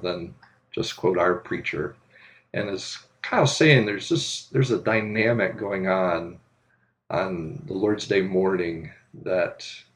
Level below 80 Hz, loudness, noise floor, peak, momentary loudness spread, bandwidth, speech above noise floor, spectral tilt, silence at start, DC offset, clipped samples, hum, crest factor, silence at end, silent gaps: -60 dBFS; -24 LUFS; -67 dBFS; -2 dBFS; 14 LU; 11 kHz; 43 dB; -5 dB/octave; 0 s; under 0.1%; under 0.1%; none; 22 dB; 0.15 s; none